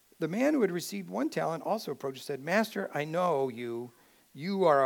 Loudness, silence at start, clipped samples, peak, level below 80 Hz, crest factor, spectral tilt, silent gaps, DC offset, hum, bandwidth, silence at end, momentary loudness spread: -31 LUFS; 0.2 s; under 0.1%; -12 dBFS; -84 dBFS; 18 dB; -5.5 dB/octave; none; under 0.1%; none; 19 kHz; 0 s; 11 LU